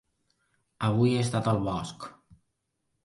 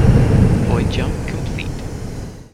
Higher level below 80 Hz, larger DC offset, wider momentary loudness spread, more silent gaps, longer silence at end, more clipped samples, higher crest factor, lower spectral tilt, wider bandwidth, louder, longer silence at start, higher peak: second, -56 dBFS vs -24 dBFS; neither; about the same, 17 LU vs 15 LU; neither; first, 0.95 s vs 0.1 s; neither; about the same, 18 dB vs 16 dB; about the same, -6.5 dB/octave vs -7.5 dB/octave; second, 11.5 kHz vs 13 kHz; second, -27 LUFS vs -18 LUFS; first, 0.8 s vs 0 s; second, -12 dBFS vs 0 dBFS